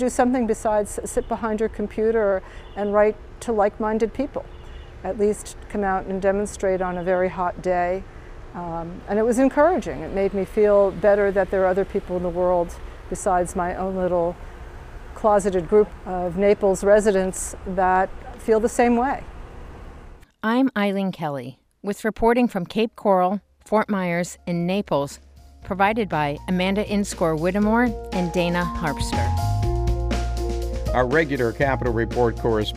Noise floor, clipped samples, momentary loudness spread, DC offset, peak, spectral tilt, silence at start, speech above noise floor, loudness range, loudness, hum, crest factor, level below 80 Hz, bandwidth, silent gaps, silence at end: -43 dBFS; under 0.1%; 13 LU; under 0.1%; -6 dBFS; -6 dB/octave; 0 s; 22 dB; 4 LU; -22 LUFS; none; 16 dB; -36 dBFS; 15.5 kHz; none; 0 s